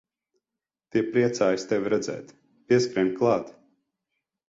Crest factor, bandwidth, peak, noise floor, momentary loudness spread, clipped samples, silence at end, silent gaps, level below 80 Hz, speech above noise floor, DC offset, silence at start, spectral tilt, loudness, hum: 18 dB; 7.8 kHz; -10 dBFS; -89 dBFS; 9 LU; under 0.1%; 1 s; none; -66 dBFS; 65 dB; under 0.1%; 0.95 s; -5.5 dB/octave; -25 LUFS; none